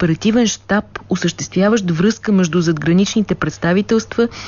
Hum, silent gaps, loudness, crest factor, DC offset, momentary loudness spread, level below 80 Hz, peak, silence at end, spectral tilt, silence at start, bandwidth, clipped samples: none; none; -16 LUFS; 12 dB; under 0.1%; 5 LU; -44 dBFS; -4 dBFS; 0 s; -5.5 dB/octave; 0 s; 7.4 kHz; under 0.1%